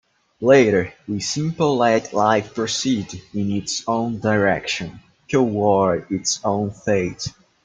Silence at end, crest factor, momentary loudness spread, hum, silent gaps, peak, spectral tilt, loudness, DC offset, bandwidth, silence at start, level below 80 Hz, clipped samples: 0.35 s; 18 dB; 10 LU; none; none; -2 dBFS; -4.5 dB/octave; -20 LUFS; under 0.1%; 9.6 kHz; 0.4 s; -54 dBFS; under 0.1%